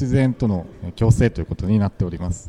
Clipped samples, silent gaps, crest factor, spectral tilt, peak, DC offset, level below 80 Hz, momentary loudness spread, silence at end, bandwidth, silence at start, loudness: under 0.1%; none; 18 dB; -8 dB/octave; -2 dBFS; under 0.1%; -34 dBFS; 9 LU; 0 s; 11 kHz; 0 s; -20 LUFS